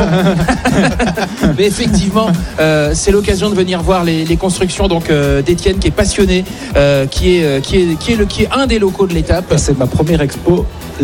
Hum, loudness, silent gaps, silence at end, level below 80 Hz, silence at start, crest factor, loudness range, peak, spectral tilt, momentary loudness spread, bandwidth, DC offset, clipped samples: none; -12 LUFS; none; 0 s; -22 dBFS; 0 s; 12 dB; 1 LU; 0 dBFS; -5.5 dB/octave; 3 LU; 17 kHz; under 0.1%; under 0.1%